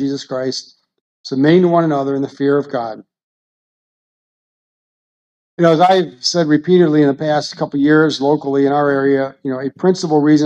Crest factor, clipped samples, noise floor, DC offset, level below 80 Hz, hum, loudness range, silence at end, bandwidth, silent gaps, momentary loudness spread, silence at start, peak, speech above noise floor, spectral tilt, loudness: 16 dB; under 0.1%; under -90 dBFS; under 0.1%; -64 dBFS; none; 9 LU; 0 s; 8.4 kHz; 1.01-1.24 s, 3.23-5.57 s; 11 LU; 0 s; 0 dBFS; over 76 dB; -6 dB/octave; -15 LUFS